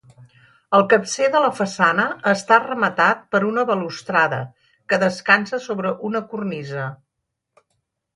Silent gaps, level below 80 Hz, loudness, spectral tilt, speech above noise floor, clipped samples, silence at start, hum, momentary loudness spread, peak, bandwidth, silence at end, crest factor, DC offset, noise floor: none; -66 dBFS; -19 LUFS; -4.5 dB/octave; 59 dB; under 0.1%; 0.2 s; none; 11 LU; -2 dBFS; 11.5 kHz; 1.2 s; 20 dB; under 0.1%; -79 dBFS